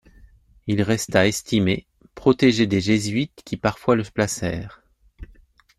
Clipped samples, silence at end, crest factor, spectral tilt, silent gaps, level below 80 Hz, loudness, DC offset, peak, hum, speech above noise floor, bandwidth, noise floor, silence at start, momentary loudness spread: under 0.1%; 0.55 s; 20 dB; -5 dB/octave; none; -48 dBFS; -21 LUFS; under 0.1%; -4 dBFS; none; 32 dB; 14.5 kHz; -53 dBFS; 0.65 s; 11 LU